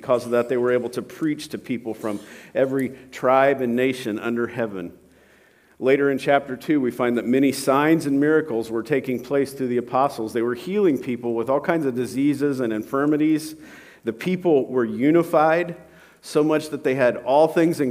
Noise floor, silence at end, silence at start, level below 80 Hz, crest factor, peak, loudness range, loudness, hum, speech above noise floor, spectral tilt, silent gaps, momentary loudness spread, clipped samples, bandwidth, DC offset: -55 dBFS; 0 s; 0 s; -66 dBFS; 18 dB; -2 dBFS; 3 LU; -22 LUFS; none; 34 dB; -6 dB/octave; none; 11 LU; under 0.1%; 16 kHz; under 0.1%